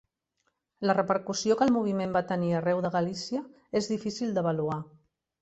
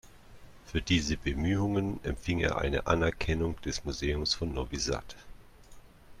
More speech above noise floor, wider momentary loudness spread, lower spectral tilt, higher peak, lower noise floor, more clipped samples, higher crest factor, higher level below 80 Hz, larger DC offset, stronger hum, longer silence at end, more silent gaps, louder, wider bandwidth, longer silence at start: first, 50 dB vs 21 dB; about the same, 9 LU vs 7 LU; about the same, -5.5 dB/octave vs -5 dB/octave; about the same, -10 dBFS vs -12 dBFS; first, -78 dBFS vs -52 dBFS; neither; about the same, 20 dB vs 20 dB; second, -66 dBFS vs -42 dBFS; neither; neither; first, 0.55 s vs 0.05 s; neither; about the same, -29 LUFS vs -31 LUFS; second, 8.2 kHz vs 14 kHz; first, 0.8 s vs 0.05 s